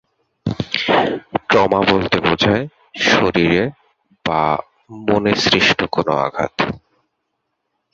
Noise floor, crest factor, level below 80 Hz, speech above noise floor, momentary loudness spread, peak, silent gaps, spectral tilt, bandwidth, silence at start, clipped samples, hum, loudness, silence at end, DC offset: -73 dBFS; 16 dB; -46 dBFS; 57 dB; 11 LU; -2 dBFS; none; -5 dB/octave; 7.8 kHz; 0.45 s; under 0.1%; none; -17 LUFS; 1.15 s; under 0.1%